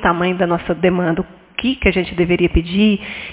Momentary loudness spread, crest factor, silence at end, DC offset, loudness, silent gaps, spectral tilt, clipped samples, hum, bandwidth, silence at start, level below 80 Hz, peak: 7 LU; 16 dB; 0 s; under 0.1%; -17 LUFS; none; -10.5 dB/octave; under 0.1%; none; 4 kHz; 0 s; -30 dBFS; 0 dBFS